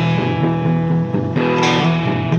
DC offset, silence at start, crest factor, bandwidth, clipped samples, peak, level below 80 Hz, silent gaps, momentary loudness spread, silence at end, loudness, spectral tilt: under 0.1%; 0 s; 14 dB; 7.2 kHz; under 0.1%; -2 dBFS; -48 dBFS; none; 4 LU; 0 s; -17 LUFS; -6.5 dB/octave